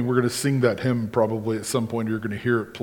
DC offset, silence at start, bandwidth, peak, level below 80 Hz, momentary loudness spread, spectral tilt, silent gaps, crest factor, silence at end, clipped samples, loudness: under 0.1%; 0 s; 19 kHz; -6 dBFS; -58 dBFS; 5 LU; -6 dB/octave; none; 18 dB; 0 s; under 0.1%; -24 LUFS